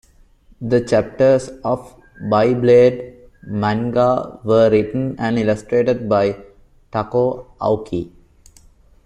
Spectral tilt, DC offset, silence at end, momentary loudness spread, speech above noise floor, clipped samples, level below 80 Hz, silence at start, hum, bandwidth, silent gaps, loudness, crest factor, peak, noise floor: -7.5 dB/octave; under 0.1%; 1 s; 14 LU; 33 dB; under 0.1%; -48 dBFS; 0.6 s; none; 10.5 kHz; none; -17 LUFS; 16 dB; -2 dBFS; -50 dBFS